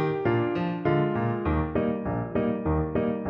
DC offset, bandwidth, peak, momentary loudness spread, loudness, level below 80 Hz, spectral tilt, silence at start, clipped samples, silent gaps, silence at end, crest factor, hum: under 0.1%; 5.6 kHz; -10 dBFS; 3 LU; -27 LUFS; -40 dBFS; -10.5 dB/octave; 0 s; under 0.1%; none; 0 s; 16 dB; none